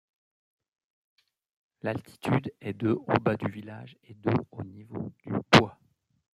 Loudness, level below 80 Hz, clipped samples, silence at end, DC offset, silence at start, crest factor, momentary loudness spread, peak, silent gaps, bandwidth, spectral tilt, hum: -28 LUFS; -62 dBFS; under 0.1%; 0.65 s; under 0.1%; 1.85 s; 28 dB; 21 LU; -2 dBFS; none; 15 kHz; -6 dB/octave; none